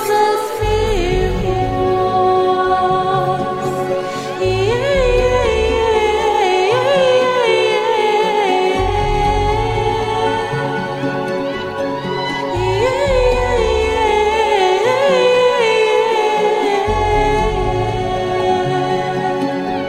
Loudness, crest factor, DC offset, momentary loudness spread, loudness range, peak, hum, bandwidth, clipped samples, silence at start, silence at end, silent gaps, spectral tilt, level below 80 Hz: -15 LUFS; 14 dB; under 0.1%; 6 LU; 4 LU; -2 dBFS; none; 15.5 kHz; under 0.1%; 0 s; 0 s; none; -5 dB/octave; -28 dBFS